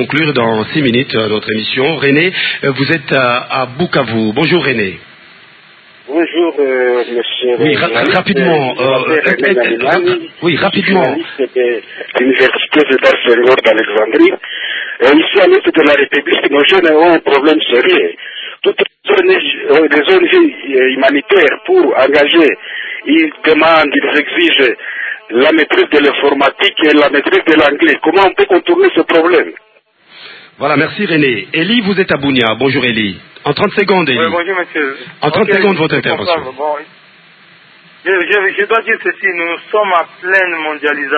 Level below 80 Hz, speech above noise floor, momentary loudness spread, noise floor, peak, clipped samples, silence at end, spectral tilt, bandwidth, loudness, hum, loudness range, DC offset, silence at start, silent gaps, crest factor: -52 dBFS; 36 dB; 8 LU; -47 dBFS; 0 dBFS; 0.1%; 0 s; -7 dB/octave; 8 kHz; -11 LUFS; none; 5 LU; under 0.1%; 0 s; none; 12 dB